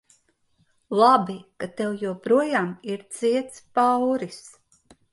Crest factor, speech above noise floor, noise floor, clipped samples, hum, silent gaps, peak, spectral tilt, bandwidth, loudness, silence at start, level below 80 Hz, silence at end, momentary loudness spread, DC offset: 18 dB; 43 dB; -66 dBFS; under 0.1%; none; none; -6 dBFS; -5.5 dB/octave; 11.5 kHz; -23 LUFS; 0.9 s; -70 dBFS; 0.65 s; 16 LU; under 0.1%